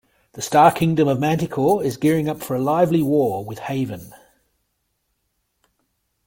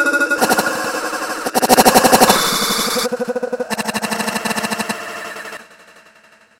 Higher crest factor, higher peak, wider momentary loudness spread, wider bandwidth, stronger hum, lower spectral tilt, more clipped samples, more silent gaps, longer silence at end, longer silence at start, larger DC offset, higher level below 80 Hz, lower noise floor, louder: about the same, 18 dB vs 18 dB; about the same, -2 dBFS vs 0 dBFS; second, 13 LU vs 16 LU; second, 17 kHz vs over 20 kHz; neither; first, -6.5 dB/octave vs -2 dB/octave; second, under 0.1% vs 0.1%; neither; first, 2.1 s vs 0.95 s; first, 0.35 s vs 0 s; neither; second, -56 dBFS vs -48 dBFS; first, -72 dBFS vs -49 dBFS; second, -19 LUFS vs -15 LUFS